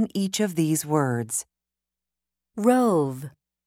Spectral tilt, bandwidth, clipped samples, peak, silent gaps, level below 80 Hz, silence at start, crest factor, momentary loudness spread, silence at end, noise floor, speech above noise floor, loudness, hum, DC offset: -5.5 dB/octave; 16.5 kHz; under 0.1%; -8 dBFS; none; -70 dBFS; 0 s; 18 dB; 14 LU; 0.35 s; -88 dBFS; 65 dB; -24 LUFS; none; under 0.1%